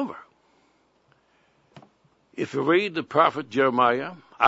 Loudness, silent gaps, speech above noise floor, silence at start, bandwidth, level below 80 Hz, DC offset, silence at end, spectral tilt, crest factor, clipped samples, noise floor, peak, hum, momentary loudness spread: -23 LUFS; none; 42 dB; 0 s; 8 kHz; -74 dBFS; under 0.1%; 0 s; -6 dB/octave; 24 dB; under 0.1%; -64 dBFS; -2 dBFS; none; 16 LU